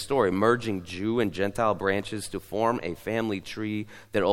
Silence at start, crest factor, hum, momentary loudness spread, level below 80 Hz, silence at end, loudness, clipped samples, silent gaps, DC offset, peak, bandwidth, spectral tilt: 0 s; 20 dB; none; 9 LU; -56 dBFS; 0 s; -28 LUFS; under 0.1%; none; under 0.1%; -8 dBFS; 16.5 kHz; -5.5 dB/octave